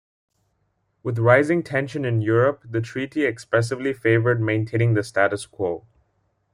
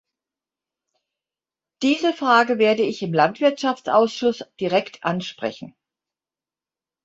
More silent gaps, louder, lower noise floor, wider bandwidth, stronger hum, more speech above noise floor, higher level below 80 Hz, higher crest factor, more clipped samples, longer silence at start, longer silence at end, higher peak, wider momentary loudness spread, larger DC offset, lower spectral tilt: neither; about the same, -22 LUFS vs -21 LUFS; second, -70 dBFS vs under -90 dBFS; first, 11 kHz vs 8 kHz; neither; second, 49 dB vs over 70 dB; first, -60 dBFS vs -68 dBFS; about the same, 18 dB vs 20 dB; neither; second, 1.05 s vs 1.8 s; second, 0.75 s vs 1.35 s; about the same, -4 dBFS vs -4 dBFS; about the same, 10 LU vs 11 LU; neither; first, -7 dB/octave vs -5 dB/octave